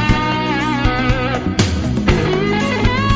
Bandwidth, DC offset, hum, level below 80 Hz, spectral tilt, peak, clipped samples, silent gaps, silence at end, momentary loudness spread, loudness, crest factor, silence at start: 8 kHz; under 0.1%; none; -24 dBFS; -6 dB/octave; 0 dBFS; under 0.1%; none; 0 s; 2 LU; -17 LUFS; 14 dB; 0 s